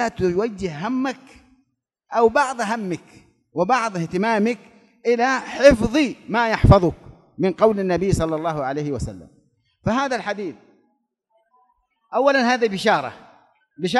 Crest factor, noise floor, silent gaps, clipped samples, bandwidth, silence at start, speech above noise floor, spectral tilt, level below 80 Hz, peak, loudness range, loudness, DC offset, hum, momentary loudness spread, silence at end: 22 dB; -70 dBFS; none; under 0.1%; 12 kHz; 0 s; 51 dB; -6 dB/octave; -38 dBFS; 0 dBFS; 8 LU; -20 LUFS; under 0.1%; none; 14 LU; 0 s